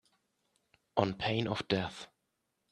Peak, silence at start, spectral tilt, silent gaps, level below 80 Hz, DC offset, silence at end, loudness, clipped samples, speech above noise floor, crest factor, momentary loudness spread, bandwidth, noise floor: -12 dBFS; 0.95 s; -6 dB/octave; none; -66 dBFS; under 0.1%; 0.65 s; -34 LUFS; under 0.1%; 49 dB; 26 dB; 14 LU; 11.5 kHz; -82 dBFS